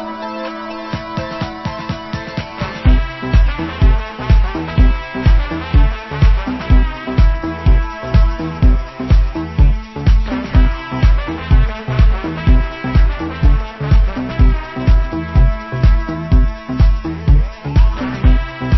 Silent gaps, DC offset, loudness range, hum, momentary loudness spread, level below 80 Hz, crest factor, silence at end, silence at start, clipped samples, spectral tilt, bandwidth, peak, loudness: none; under 0.1%; 2 LU; none; 8 LU; -14 dBFS; 12 dB; 0 s; 0 s; under 0.1%; -8 dB/octave; 6 kHz; 0 dBFS; -16 LUFS